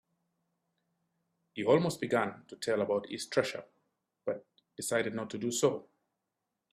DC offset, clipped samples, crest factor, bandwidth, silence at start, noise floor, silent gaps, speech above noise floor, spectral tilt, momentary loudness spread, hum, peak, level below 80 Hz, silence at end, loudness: under 0.1%; under 0.1%; 22 dB; 15 kHz; 1.55 s; -86 dBFS; none; 54 dB; -4.5 dB/octave; 14 LU; none; -14 dBFS; -76 dBFS; 0.9 s; -33 LUFS